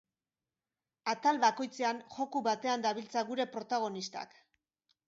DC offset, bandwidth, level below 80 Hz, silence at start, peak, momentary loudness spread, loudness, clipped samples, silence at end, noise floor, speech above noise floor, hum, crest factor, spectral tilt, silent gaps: under 0.1%; 7.6 kHz; -86 dBFS; 1.05 s; -14 dBFS; 11 LU; -34 LUFS; under 0.1%; 0.8 s; under -90 dBFS; over 56 dB; none; 20 dB; -1.5 dB/octave; none